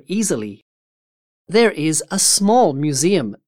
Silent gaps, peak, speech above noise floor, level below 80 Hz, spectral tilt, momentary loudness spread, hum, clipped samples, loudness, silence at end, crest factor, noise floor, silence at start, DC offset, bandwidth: 0.62-1.45 s; -4 dBFS; over 73 dB; -62 dBFS; -3.5 dB/octave; 8 LU; none; under 0.1%; -16 LUFS; 0.1 s; 16 dB; under -90 dBFS; 0.1 s; 0.7%; 18 kHz